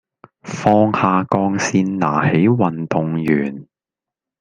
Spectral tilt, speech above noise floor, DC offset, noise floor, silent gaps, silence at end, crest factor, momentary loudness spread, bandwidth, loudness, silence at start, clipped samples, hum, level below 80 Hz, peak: -6.5 dB/octave; 72 dB; under 0.1%; -88 dBFS; none; 0.8 s; 16 dB; 6 LU; 9.8 kHz; -17 LUFS; 0.45 s; under 0.1%; none; -56 dBFS; -2 dBFS